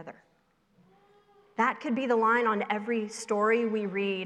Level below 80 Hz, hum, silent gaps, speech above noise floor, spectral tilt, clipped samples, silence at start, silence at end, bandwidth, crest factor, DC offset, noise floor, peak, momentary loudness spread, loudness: -80 dBFS; none; none; 41 dB; -5 dB/octave; under 0.1%; 0 s; 0 s; 12 kHz; 18 dB; under 0.1%; -69 dBFS; -12 dBFS; 8 LU; -28 LUFS